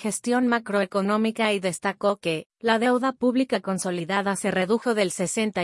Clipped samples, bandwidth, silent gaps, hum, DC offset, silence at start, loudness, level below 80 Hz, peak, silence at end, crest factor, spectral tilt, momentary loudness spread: under 0.1%; 12 kHz; 2.46-2.50 s; none; under 0.1%; 0 s; -24 LUFS; -70 dBFS; -6 dBFS; 0 s; 18 dB; -4.5 dB/octave; 4 LU